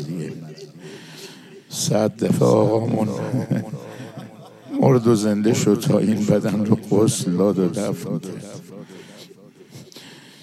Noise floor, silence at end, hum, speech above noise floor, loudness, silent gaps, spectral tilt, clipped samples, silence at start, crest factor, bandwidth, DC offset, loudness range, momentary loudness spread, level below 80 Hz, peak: -46 dBFS; 0.25 s; none; 26 dB; -20 LUFS; none; -6.5 dB/octave; under 0.1%; 0 s; 18 dB; 14.5 kHz; under 0.1%; 4 LU; 22 LU; -70 dBFS; -2 dBFS